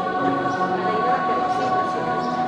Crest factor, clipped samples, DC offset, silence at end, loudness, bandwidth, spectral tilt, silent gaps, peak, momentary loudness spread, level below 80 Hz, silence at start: 14 dB; under 0.1%; under 0.1%; 0 s; -22 LUFS; 9.8 kHz; -6 dB/octave; none; -6 dBFS; 2 LU; -58 dBFS; 0 s